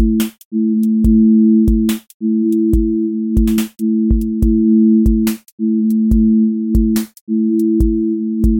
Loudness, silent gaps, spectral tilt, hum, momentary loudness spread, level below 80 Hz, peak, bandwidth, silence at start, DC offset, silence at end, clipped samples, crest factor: -14 LUFS; 0.45-0.51 s, 2.14-2.20 s, 5.52-5.58 s, 7.21-7.27 s; -7.5 dB/octave; none; 8 LU; -22 dBFS; -2 dBFS; 17 kHz; 0 s; under 0.1%; 0 s; under 0.1%; 12 dB